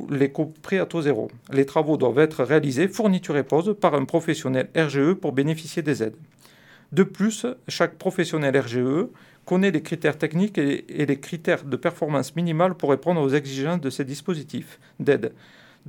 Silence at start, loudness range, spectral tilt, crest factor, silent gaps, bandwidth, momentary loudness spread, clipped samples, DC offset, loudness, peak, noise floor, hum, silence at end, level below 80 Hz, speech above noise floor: 0 s; 3 LU; -6.5 dB/octave; 20 dB; none; 18 kHz; 7 LU; under 0.1%; under 0.1%; -23 LUFS; -4 dBFS; -52 dBFS; none; 0.6 s; -70 dBFS; 29 dB